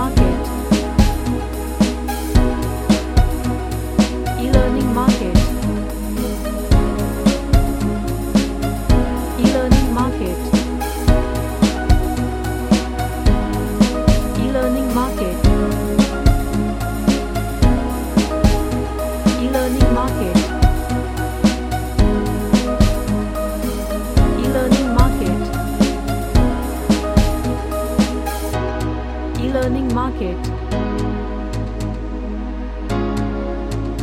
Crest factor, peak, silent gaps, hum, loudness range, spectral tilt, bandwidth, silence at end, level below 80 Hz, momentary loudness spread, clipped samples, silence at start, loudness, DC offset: 16 dB; 0 dBFS; none; none; 3 LU; -6 dB/octave; 16.5 kHz; 0 s; -22 dBFS; 7 LU; under 0.1%; 0 s; -19 LUFS; under 0.1%